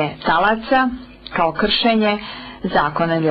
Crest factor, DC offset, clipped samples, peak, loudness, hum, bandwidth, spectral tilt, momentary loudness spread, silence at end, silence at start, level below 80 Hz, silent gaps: 12 dB; under 0.1%; under 0.1%; -6 dBFS; -18 LUFS; none; 5.6 kHz; -9 dB/octave; 11 LU; 0 s; 0 s; -42 dBFS; none